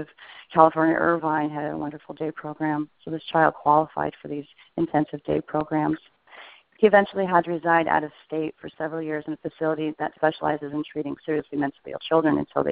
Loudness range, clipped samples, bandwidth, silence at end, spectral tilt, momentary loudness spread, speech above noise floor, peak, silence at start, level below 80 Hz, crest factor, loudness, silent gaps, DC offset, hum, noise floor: 5 LU; under 0.1%; 4.8 kHz; 0 s; -5 dB/octave; 14 LU; 24 dB; 0 dBFS; 0 s; -60 dBFS; 24 dB; -24 LUFS; none; under 0.1%; none; -48 dBFS